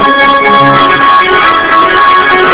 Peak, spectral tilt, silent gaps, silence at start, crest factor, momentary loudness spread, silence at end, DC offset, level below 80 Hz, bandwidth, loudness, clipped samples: 0 dBFS; -7.5 dB/octave; none; 0 s; 6 dB; 1 LU; 0 s; under 0.1%; -36 dBFS; 4 kHz; -5 LUFS; 9%